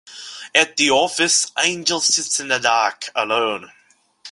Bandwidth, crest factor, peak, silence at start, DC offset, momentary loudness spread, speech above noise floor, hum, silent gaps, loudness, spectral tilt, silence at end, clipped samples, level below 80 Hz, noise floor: 11.5 kHz; 20 dB; 0 dBFS; 0.05 s; under 0.1%; 8 LU; 26 dB; none; none; -17 LUFS; -0.5 dB/octave; 0 s; under 0.1%; -64 dBFS; -45 dBFS